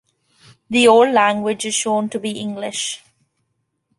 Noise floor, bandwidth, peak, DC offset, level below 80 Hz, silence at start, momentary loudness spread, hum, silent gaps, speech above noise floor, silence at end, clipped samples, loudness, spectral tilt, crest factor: -71 dBFS; 11.5 kHz; -2 dBFS; under 0.1%; -64 dBFS; 0.7 s; 14 LU; none; none; 55 dB; 1 s; under 0.1%; -17 LUFS; -3 dB/octave; 18 dB